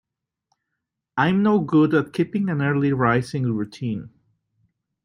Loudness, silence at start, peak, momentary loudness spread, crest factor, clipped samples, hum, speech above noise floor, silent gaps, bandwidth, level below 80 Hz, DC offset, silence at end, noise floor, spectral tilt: -21 LUFS; 1.15 s; -4 dBFS; 11 LU; 18 dB; under 0.1%; none; 61 dB; none; 11 kHz; -58 dBFS; under 0.1%; 0.95 s; -81 dBFS; -8 dB/octave